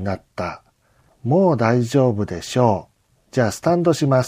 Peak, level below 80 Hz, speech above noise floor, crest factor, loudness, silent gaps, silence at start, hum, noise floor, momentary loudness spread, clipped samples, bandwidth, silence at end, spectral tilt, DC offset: -2 dBFS; -52 dBFS; 41 dB; 18 dB; -19 LUFS; none; 0 s; none; -59 dBFS; 12 LU; under 0.1%; 15.5 kHz; 0 s; -6.5 dB/octave; under 0.1%